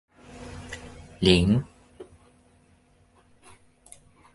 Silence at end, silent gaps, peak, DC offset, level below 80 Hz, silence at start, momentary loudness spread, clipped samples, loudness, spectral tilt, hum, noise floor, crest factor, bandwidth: 2.3 s; none; -4 dBFS; under 0.1%; -44 dBFS; 0.35 s; 29 LU; under 0.1%; -22 LUFS; -6 dB/octave; none; -61 dBFS; 26 dB; 11.5 kHz